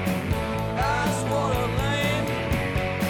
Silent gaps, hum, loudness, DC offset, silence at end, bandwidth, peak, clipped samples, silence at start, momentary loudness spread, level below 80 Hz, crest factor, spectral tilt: none; none; -25 LUFS; under 0.1%; 0 s; 18.5 kHz; -12 dBFS; under 0.1%; 0 s; 3 LU; -36 dBFS; 12 dB; -5.5 dB/octave